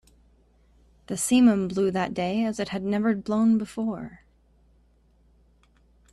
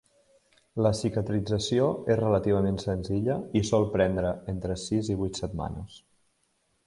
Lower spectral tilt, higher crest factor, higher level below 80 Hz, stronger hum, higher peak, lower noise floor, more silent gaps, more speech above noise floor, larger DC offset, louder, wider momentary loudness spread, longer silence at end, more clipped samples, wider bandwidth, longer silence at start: about the same, -5.5 dB/octave vs -6.5 dB/octave; about the same, 18 dB vs 18 dB; second, -58 dBFS vs -48 dBFS; neither; about the same, -8 dBFS vs -10 dBFS; second, -61 dBFS vs -72 dBFS; neither; second, 37 dB vs 45 dB; neither; first, -24 LUFS vs -28 LUFS; first, 12 LU vs 9 LU; first, 1.95 s vs 0.9 s; neither; first, 13 kHz vs 11.5 kHz; first, 1.1 s vs 0.75 s